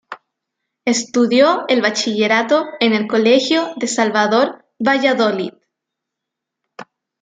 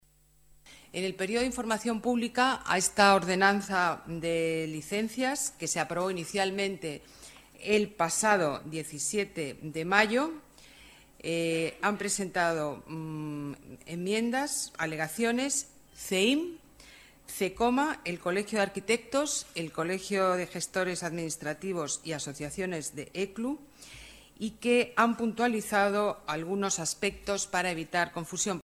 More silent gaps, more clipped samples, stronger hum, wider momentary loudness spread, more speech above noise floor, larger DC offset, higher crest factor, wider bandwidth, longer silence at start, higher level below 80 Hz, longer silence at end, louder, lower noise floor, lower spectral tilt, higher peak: neither; neither; neither; second, 8 LU vs 13 LU; first, 66 dB vs 33 dB; neither; second, 16 dB vs 24 dB; second, 9.4 kHz vs 16 kHz; second, 0.1 s vs 0.65 s; second, -68 dBFS vs -62 dBFS; first, 0.4 s vs 0 s; first, -16 LUFS vs -30 LUFS; first, -81 dBFS vs -63 dBFS; about the same, -3.5 dB/octave vs -3.5 dB/octave; first, 0 dBFS vs -6 dBFS